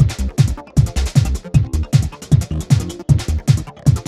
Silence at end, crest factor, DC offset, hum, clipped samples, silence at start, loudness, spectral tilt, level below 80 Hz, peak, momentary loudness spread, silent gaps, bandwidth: 0.05 s; 16 dB; under 0.1%; none; under 0.1%; 0 s; -17 LUFS; -6.5 dB/octave; -24 dBFS; 0 dBFS; 1 LU; none; 13.5 kHz